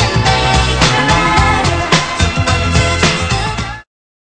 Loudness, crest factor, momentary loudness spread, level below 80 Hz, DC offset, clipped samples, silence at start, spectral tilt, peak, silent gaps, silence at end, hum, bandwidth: -12 LUFS; 12 dB; 7 LU; -22 dBFS; under 0.1%; 0.1%; 0 s; -4 dB/octave; 0 dBFS; none; 0.45 s; none; 11 kHz